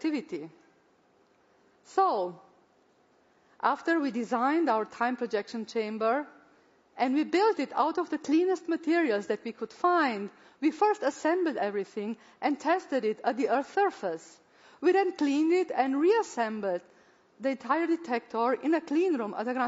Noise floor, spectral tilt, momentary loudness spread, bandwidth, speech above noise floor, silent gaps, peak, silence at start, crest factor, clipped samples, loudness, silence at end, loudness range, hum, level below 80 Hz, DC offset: -65 dBFS; -5 dB/octave; 9 LU; 8 kHz; 37 dB; none; -12 dBFS; 0.05 s; 18 dB; under 0.1%; -29 LUFS; 0 s; 3 LU; none; -82 dBFS; under 0.1%